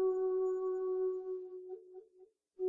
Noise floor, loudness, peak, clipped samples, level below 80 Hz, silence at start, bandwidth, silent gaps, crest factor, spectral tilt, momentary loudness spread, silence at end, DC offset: -65 dBFS; -37 LUFS; -26 dBFS; under 0.1%; -80 dBFS; 0 s; 1.6 kHz; none; 12 dB; -6.5 dB/octave; 17 LU; 0 s; under 0.1%